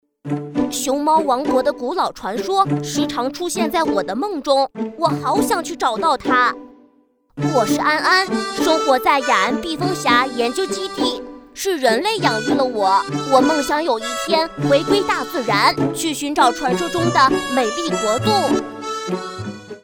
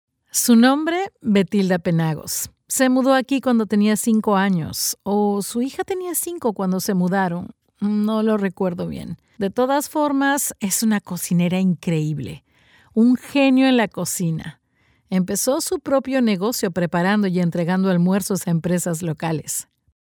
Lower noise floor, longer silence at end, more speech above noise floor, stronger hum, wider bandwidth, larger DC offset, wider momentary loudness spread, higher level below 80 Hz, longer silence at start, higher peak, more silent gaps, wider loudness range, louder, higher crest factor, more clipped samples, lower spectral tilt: second, -57 dBFS vs -62 dBFS; second, 0.05 s vs 0.4 s; about the same, 39 dB vs 42 dB; neither; about the same, over 20 kHz vs over 20 kHz; neither; about the same, 8 LU vs 8 LU; first, -52 dBFS vs -58 dBFS; about the same, 0.25 s vs 0.35 s; about the same, -2 dBFS vs -4 dBFS; neither; about the same, 3 LU vs 3 LU; about the same, -18 LUFS vs -20 LUFS; about the same, 18 dB vs 16 dB; neither; about the same, -4 dB/octave vs -5 dB/octave